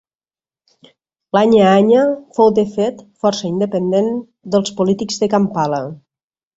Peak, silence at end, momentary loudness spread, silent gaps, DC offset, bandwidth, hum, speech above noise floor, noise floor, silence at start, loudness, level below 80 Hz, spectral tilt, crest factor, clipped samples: -2 dBFS; 0.6 s; 10 LU; none; under 0.1%; 8 kHz; none; over 75 dB; under -90 dBFS; 1.35 s; -16 LUFS; -58 dBFS; -6 dB/octave; 14 dB; under 0.1%